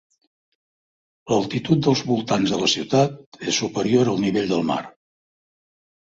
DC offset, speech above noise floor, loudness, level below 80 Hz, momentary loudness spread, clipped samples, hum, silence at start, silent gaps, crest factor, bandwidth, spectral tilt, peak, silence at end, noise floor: under 0.1%; over 69 dB; -21 LUFS; -58 dBFS; 5 LU; under 0.1%; none; 1.25 s; 3.26-3.32 s; 18 dB; 7.8 kHz; -5 dB/octave; -4 dBFS; 1.2 s; under -90 dBFS